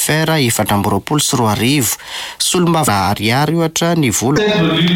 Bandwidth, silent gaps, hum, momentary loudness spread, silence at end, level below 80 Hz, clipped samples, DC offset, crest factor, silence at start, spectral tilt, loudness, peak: 17 kHz; none; none; 3 LU; 0 s; -44 dBFS; under 0.1%; under 0.1%; 12 dB; 0 s; -4 dB/octave; -14 LUFS; -2 dBFS